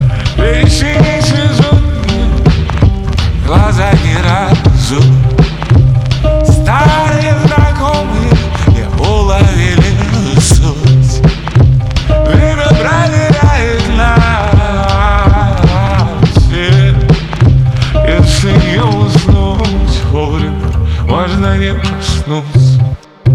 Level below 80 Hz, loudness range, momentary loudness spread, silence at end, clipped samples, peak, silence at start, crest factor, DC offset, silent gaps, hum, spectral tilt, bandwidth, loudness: -14 dBFS; 2 LU; 4 LU; 0 s; under 0.1%; 0 dBFS; 0 s; 8 dB; under 0.1%; none; none; -6 dB/octave; 12 kHz; -10 LUFS